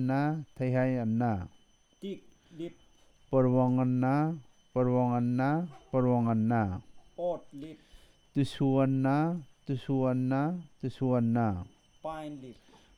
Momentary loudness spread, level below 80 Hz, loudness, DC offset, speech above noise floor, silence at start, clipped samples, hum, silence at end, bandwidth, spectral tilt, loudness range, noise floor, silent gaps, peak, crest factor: 17 LU; -62 dBFS; -30 LUFS; under 0.1%; 32 dB; 0 s; under 0.1%; none; 0.45 s; 10.5 kHz; -9 dB/octave; 3 LU; -61 dBFS; none; -14 dBFS; 16 dB